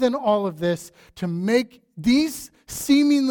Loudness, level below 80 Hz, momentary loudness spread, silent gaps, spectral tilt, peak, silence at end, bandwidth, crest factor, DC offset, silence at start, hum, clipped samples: -22 LUFS; -54 dBFS; 16 LU; none; -5 dB/octave; -8 dBFS; 0 s; 18 kHz; 14 dB; under 0.1%; 0 s; none; under 0.1%